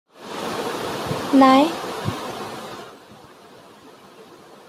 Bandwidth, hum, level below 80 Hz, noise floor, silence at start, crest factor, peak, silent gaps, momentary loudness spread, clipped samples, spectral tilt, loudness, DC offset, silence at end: 15.5 kHz; none; -60 dBFS; -46 dBFS; 0.2 s; 20 dB; -2 dBFS; none; 21 LU; under 0.1%; -5 dB/octave; -20 LUFS; under 0.1%; 0.15 s